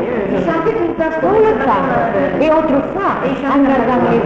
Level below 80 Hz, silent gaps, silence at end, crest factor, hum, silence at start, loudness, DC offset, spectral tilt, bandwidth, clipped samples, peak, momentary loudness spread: -40 dBFS; none; 0 s; 10 dB; none; 0 s; -14 LUFS; under 0.1%; -8 dB/octave; 7.4 kHz; under 0.1%; -4 dBFS; 4 LU